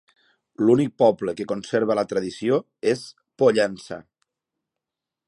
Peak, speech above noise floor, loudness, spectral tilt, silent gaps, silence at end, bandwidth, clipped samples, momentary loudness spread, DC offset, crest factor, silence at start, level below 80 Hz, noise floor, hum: -4 dBFS; 65 dB; -22 LUFS; -6 dB/octave; none; 1.25 s; 11.5 kHz; under 0.1%; 13 LU; under 0.1%; 18 dB; 0.6 s; -66 dBFS; -87 dBFS; none